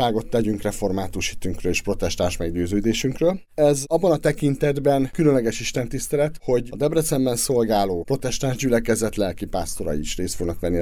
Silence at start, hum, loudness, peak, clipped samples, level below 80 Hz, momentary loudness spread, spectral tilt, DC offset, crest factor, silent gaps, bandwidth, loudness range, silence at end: 0 s; none; -22 LUFS; -6 dBFS; under 0.1%; -36 dBFS; 7 LU; -5 dB/octave; under 0.1%; 16 dB; none; over 20 kHz; 3 LU; 0 s